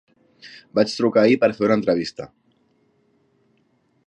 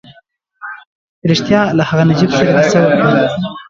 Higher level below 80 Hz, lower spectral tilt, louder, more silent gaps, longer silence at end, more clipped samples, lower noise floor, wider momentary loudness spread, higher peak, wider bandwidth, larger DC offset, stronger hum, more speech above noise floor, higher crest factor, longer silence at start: second, -64 dBFS vs -46 dBFS; about the same, -6 dB/octave vs -6.5 dB/octave; second, -19 LUFS vs -12 LUFS; second, none vs 0.87-1.22 s; first, 1.8 s vs 0.05 s; neither; first, -64 dBFS vs -50 dBFS; first, 24 LU vs 19 LU; second, -4 dBFS vs 0 dBFS; first, 9.8 kHz vs 7.6 kHz; neither; neither; first, 45 dB vs 38 dB; first, 20 dB vs 12 dB; first, 0.45 s vs 0.1 s